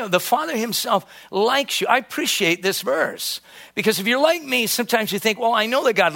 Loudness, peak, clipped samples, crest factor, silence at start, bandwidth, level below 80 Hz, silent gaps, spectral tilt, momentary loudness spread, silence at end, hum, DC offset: -20 LUFS; -2 dBFS; under 0.1%; 18 dB; 0 s; 17 kHz; -70 dBFS; none; -2.5 dB/octave; 5 LU; 0 s; none; under 0.1%